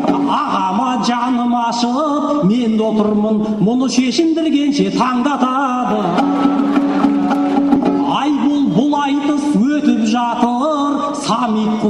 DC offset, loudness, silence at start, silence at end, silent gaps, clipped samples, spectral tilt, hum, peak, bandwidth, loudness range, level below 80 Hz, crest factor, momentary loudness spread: under 0.1%; -15 LUFS; 0 s; 0 s; none; under 0.1%; -6 dB/octave; none; -2 dBFS; 10.5 kHz; 1 LU; -52 dBFS; 12 dB; 2 LU